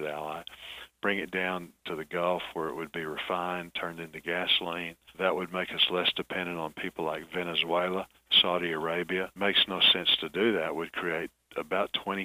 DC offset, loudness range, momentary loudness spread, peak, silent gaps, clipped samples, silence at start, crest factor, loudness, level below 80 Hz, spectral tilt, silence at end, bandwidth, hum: under 0.1%; 7 LU; 15 LU; -10 dBFS; none; under 0.1%; 0 s; 20 dB; -29 LUFS; -66 dBFS; -4.5 dB/octave; 0 s; 15.5 kHz; none